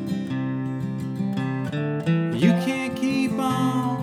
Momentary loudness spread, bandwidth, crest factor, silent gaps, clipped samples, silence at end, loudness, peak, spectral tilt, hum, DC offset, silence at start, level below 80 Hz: 8 LU; 14.5 kHz; 16 dB; none; under 0.1%; 0 s; -24 LUFS; -8 dBFS; -7 dB/octave; none; under 0.1%; 0 s; -62 dBFS